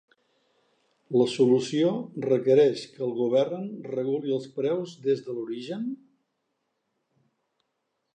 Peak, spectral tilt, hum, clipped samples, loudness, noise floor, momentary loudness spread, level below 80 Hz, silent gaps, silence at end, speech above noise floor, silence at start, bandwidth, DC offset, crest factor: -10 dBFS; -6.5 dB/octave; none; under 0.1%; -26 LUFS; -79 dBFS; 13 LU; -80 dBFS; none; 2.2 s; 53 dB; 1.1 s; 9.4 kHz; under 0.1%; 18 dB